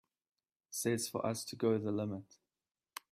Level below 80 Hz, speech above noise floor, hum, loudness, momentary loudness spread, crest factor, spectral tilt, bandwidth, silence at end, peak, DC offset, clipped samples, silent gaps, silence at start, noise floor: -78 dBFS; over 54 dB; none; -37 LUFS; 14 LU; 18 dB; -5 dB/octave; 16 kHz; 0.9 s; -20 dBFS; under 0.1%; under 0.1%; none; 0.7 s; under -90 dBFS